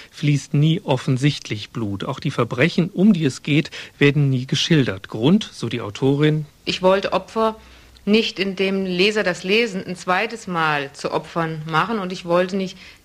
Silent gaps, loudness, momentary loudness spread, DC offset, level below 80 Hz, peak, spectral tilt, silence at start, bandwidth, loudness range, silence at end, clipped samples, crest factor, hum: none; -20 LUFS; 9 LU; under 0.1%; -54 dBFS; -4 dBFS; -6 dB/octave; 0 s; 12.5 kHz; 2 LU; 0.15 s; under 0.1%; 16 dB; none